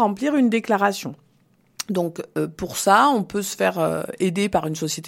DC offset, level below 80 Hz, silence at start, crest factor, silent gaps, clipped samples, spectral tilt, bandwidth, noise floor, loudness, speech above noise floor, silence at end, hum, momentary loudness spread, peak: under 0.1%; -56 dBFS; 0 s; 20 dB; none; under 0.1%; -4.5 dB/octave; 16.5 kHz; -60 dBFS; -21 LUFS; 39 dB; 0 s; none; 11 LU; -2 dBFS